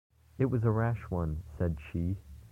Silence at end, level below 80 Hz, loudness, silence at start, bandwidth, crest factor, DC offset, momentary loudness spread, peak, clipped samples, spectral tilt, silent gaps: 0.05 s; -46 dBFS; -33 LUFS; 0.4 s; 3.8 kHz; 16 dB; under 0.1%; 8 LU; -16 dBFS; under 0.1%; -10 dB/octave; none